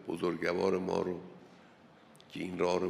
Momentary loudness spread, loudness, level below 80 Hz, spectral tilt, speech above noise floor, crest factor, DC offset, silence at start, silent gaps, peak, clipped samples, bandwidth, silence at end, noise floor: 17 LU; -34 LUFS; -72 dBFS; -6 dB/octave; 26 dB; 18 dB; under 0.1%; 0 s; none; -16 dBFS; under 0.1%; 13.5 kHz; 0 s; -59 dBFS